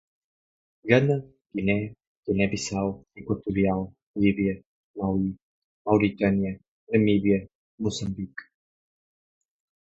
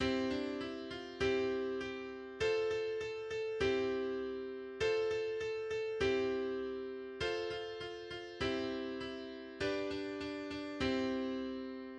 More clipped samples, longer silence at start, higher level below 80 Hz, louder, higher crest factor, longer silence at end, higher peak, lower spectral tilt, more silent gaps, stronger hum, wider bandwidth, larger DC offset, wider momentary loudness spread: neither; first, 0.85 s vs 0 s; first, -52 dBFS vs -60 dBFS; first, -26 LUFS vs -38 LUFS; first, 24 dB vs 16 dB; first, 1.45 s vs 0 s; first, -4 dBFS vs -22 dBFS; first, -6.5 dB/octave vs -5 dB/octave; first, 2.07-2.23 s, 4.03-4.14 s, 4.66-4.94 s, 5.43-5.85 s, 6.68-6.87 s, 7.55-7.78 s vs none; neither; second, 8 kHz vs 9.8 kHz; neither; first, 16 LU vs 10 LU